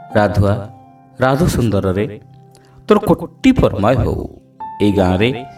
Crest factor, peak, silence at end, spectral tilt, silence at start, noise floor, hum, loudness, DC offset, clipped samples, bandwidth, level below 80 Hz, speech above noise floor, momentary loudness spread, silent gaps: 16 dB; 0 dBFS; 0.05 s; -7 dB/octave; 0 s; -43 dBFS; none; -15 LUFS; under 0.1%; under 0.1%; 15.5 kHz; -32 dBFS; 29 dB; 15 LU; none